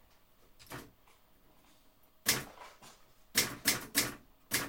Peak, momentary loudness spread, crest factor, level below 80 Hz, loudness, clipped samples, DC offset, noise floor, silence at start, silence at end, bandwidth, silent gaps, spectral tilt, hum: -12 dBFS; 21 LU; 28 dB; -64 dBFS; -32 LUFS; under 0.1%; under 0.1%; -65 dBFS; 0.6 s; 0 s; 17 kHz; none; -1 dB/octave; none